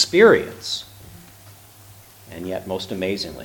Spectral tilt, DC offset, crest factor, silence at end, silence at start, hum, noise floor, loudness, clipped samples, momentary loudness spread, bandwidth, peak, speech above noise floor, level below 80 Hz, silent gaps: -4 dB/octave; under 0.1%; 20 dB; 0 s; 0 s; none; -46 dBFS; -20 LUFS; under 0.1%; 21 LU; 19 kHz; -2 dBFS; 27 dB; -54 dBFS; none